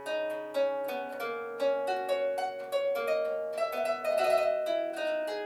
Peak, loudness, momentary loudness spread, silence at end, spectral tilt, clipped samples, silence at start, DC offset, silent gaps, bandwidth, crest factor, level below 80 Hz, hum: -14 dBFS; -31 LUFS; 7 LU; 0 s; -2.5 dB/octave; under 0.1%; 0 s; under 0.1%; none; 14.5 kHz; 16 dB; -78 dBFS; none